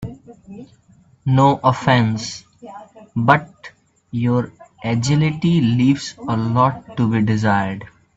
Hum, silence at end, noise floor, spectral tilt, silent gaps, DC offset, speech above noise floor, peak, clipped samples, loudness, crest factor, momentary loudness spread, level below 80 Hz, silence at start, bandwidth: none; 0.3 s; -39 dBFS; -6.5 dB/octave; none; under 0.1%; 22 dB; 0 dBFS; under 0.1%; -18 LUFS; 18 dB; 19 LU; -52 dBFS; 0 s; 8 kHz